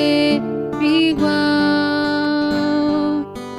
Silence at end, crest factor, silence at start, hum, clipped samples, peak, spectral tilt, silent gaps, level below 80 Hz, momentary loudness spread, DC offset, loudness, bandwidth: 0 s; 12 dB; 0 s; none; under 0.1%; -6 dBFS; -5.5 dB/octave; none; -50 dBFS; 5 LU; under 0.1%; -17 LUFS; 12 kHz